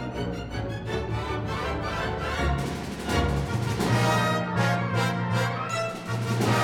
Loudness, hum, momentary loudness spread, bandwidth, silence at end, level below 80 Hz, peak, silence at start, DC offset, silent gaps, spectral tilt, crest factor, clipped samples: -27 LUFS; none; 8 LU; 16.5 kHz; 0 s; -40 dBFS; -10 dBFS; 0 s; under 0.1%; none; -5.5 dB/octave; 16 dB; under 0.1%